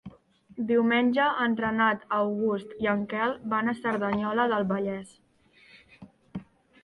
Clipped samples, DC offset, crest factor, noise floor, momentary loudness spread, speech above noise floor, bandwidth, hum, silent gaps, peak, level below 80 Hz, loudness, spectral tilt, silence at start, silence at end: under 0.1%; under 0.1%; 16 dB; -59 dBFS; 15 LU; 33 dB; 10.5 kHz; none; none; -12 dBFS; -64 dBFS; -27 LUFS; -7 dB/octave; 0.05 s; 0.4 s